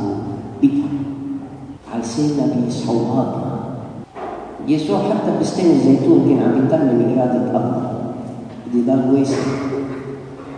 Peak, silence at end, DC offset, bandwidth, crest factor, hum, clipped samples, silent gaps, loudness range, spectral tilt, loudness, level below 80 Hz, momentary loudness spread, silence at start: -2 dBFS; 0 s; under 0.1%; 9.8 kHz; 16 dB; none; under 0.1%; none; 6 LU; -7.5 dB/octave; -18 LUFS; -52 dBFS; 16 LU; 0 s